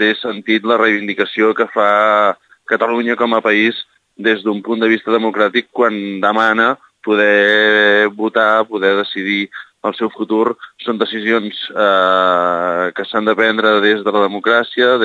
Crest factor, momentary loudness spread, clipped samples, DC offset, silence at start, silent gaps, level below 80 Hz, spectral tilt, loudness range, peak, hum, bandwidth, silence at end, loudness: 14 dB; 8 LU; under 0.1%; under 0.1%; 0 s; none; -70 dBFS; -5.5 dB/octave; 4 LU; 0 dBFS; none; 8 kHz; 0 s; -14 LUFS